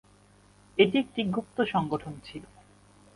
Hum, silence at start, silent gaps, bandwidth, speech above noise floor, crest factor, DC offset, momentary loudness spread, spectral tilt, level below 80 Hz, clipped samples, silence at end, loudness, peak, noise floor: 50 Hz at -50 dBFS; 0.75 s; none; 11.5 kHz; 31 dB; 24 dB; under 0.1%; 19 LU; -6.5 dB/octave; -62 dBFS; under 0.1%; 0.7 s; -28 LUFS; -6 dBFS; -59 dBFS